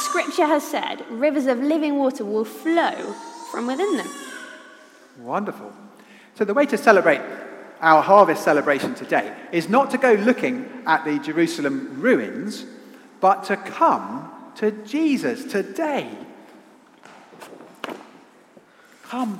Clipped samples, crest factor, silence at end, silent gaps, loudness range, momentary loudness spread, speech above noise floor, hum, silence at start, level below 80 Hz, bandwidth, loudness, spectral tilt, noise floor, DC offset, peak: under 0.1%; 22 dB; 0 s; none; 11 LU; 19 LU; 31 dB; none; 0 s; -78 dBFS; 16 kHz; -21 LUFS; -5 dB/octave; -51 dBFS; under 0.1%; 0 dBFS